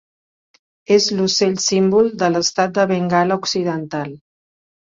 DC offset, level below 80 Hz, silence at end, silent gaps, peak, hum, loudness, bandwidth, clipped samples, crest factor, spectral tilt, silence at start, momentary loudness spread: under 0.1%; -60 dBFS; 0.7 s; none; -2 dBFS; none; -17 LUFS; 7.8 kHz; under 0.1%; 16 dB; -4 dB/octave; 0.9 s; 9 LU